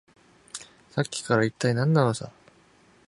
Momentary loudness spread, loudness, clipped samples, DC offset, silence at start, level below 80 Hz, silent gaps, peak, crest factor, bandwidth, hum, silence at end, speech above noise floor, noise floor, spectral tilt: 18 LU; -25 LUFS; under 0.1%; under 0.1%; 0.55 s; -64 dBFS; none; -6 dBFS; 22 dB; 11.5 kHz; none; 0.8 s; 34 dB; -58 dBFS; -6 dB/octave